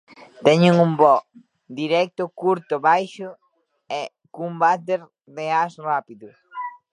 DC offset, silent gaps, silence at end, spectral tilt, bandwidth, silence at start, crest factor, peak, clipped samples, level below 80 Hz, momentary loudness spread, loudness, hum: under 0.1%; none; 0.25 s; -6.5 dB/octave; 10 kHz; 0.4 s; 20 dB; 0 dBFS; under 0.1%; -72 dBFS; 18 LU; -20 LUFS; none